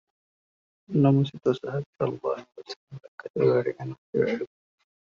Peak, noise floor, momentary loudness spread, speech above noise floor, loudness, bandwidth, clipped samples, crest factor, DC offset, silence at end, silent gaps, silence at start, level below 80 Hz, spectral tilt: -8 dBFS; under -90 dBFS; 19 LU; over 64 dB; -26 LUFS; 7 kHz; under 0.1%; 20 dB; under 0.1%; 0.65 s; 1.86-1.93 s, 2.76-2.88 s, 3.08-3.18 s, 3.30-3.34 s, 3.98-4.13 s; 0.9 s; -68 dBFS; -7.5 dB/octave